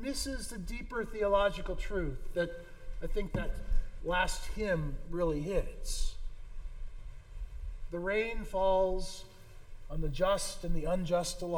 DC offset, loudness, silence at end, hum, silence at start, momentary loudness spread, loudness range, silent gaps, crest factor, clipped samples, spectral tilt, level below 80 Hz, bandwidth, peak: under 0.1%; -35 LUFS; 0 s; none; 0 s; 19 LU; 4 LU; none; 18 dB; under 0.1%; -4.5 dB/octave; -38 dBFS; 18.5 kHz; -16 dBFS